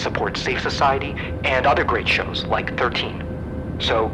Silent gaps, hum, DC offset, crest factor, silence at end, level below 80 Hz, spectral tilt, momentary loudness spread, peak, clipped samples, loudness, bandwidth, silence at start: none; none; under 0.1%; 14 dB; 0 s; -36 dBFS; -5 dB/octave; 10 LU; -6 dBFS; under 0.1%; -21 LUFS; 11.5 kHz; 0 s